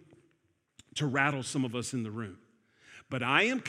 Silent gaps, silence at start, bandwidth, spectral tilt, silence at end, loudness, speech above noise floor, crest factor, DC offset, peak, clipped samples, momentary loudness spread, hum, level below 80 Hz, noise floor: none; 0.95 s; 14 kHz; -4.5 dB/octave; 0 s; -31 LUFS; 43 dB; 24 dB; under 0.1%; -10 dBFS; under 0.1%; 15 LU; none; -76 dBFS; -74 dBFS